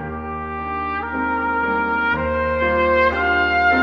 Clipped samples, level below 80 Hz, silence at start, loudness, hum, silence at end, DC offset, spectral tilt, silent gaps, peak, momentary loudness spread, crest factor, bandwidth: under 0.1%; -36 dBFS; 0 s; -19 LUFS; none; 0 s; under 0.1%; -7 dB/octave; none; -4 dBFS; 10 LU; 14 dB; 6.8 kHz